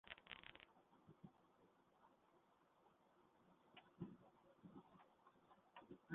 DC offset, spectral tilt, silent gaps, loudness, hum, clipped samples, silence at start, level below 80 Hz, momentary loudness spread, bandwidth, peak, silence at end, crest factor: under 0.1%; -3.5 dB/octave; none; -63 LUFS; none; under 0.1%; 0.05 s; -88 dBFS; 10 LU; 3.9 kHz; -34 dBFS; 0 s; 30 dB